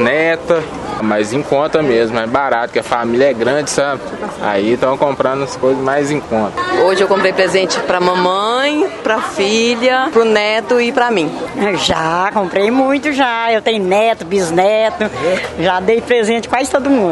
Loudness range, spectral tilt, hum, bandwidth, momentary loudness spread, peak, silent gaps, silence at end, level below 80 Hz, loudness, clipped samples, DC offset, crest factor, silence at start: 2 LU; -4 dB/octave; none; 11.5 kHz; 5 LU; 0 dBFS; none; 0 s; -46 dBFS; -14 LUFS; under 0.1%; under 0.1%; 14 dB; 0 s